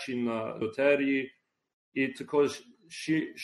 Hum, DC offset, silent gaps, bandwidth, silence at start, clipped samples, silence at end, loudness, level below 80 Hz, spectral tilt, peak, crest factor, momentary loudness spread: none; under 0.1%; 1.73-1.92 s; 12 kHz; 0 s; under 0.1%; 0 s; -30 LUFS; -74 dBFS; -5.5 dB/octave; -12 dBFS; 18 dB; 14 LU